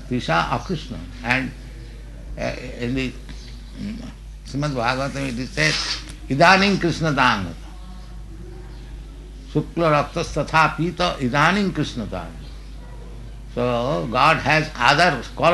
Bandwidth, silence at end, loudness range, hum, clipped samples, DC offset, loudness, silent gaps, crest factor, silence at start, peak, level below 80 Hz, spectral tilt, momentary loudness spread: 12 kHz; 0 s; 8 LU; none; under 0.1%; under 0.1%; -20 LUFS; none; 20 dB; 0 s; -2 dBFS; -36 dBFS; -5 dB/octave; 22 LU